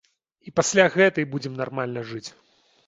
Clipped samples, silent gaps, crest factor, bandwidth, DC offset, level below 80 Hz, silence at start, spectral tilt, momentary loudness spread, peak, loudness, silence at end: under 0.1%; none; 22 dB; 8 kHz; under 0.1%; -64 dBFS; 0.45 s; -4 dB/octave; 17 LU; -2 dBFS; -22 LUFS; 0.55 s